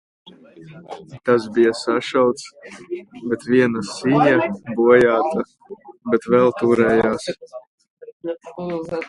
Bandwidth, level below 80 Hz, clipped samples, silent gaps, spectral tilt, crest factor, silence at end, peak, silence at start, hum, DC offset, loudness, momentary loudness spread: 11.5 kHz; -56 dBFS; under 0.1%; 7.67-7.78 s, 7.90-7.97 s, 8.13-8.20 s; -6 dB/octave; 20 dB; 0 s; 0 dBFS; 0.25 s; none; under 0.1%; -18 LUFS; 18 LU